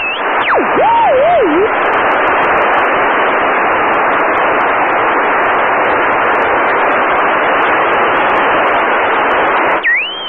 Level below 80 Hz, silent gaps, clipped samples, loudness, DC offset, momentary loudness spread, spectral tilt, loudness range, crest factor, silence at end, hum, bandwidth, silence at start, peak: -44 dBFS; none; under 0.1%; -11 LUFS; 0.4%; 2 LU; -6 dB/octave; 1 LU; 8 dB; 0 s; none; 5.8 kHz; 0 s; -4 dBFS